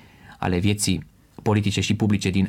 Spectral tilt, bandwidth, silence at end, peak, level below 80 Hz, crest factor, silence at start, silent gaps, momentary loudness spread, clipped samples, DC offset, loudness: -5 dB/octave; 16 kHz; 0 s; -8 dBFS; -48 dBFS; 16 dB; 0.25 s; none; 8 LU; under 0.1%; under 0.1%; -23 LUFS